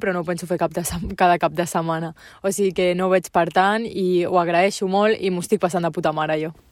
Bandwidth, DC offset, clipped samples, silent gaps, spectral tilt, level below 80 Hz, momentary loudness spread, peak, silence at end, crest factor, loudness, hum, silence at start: 16 kHz; under 0.1%; under 0.1%; none; -5 dB/octave; -48 dBFS; 8 LU; -4 dBFS; 0.2 s; 16 dB; -21 LUFS; none; 0 s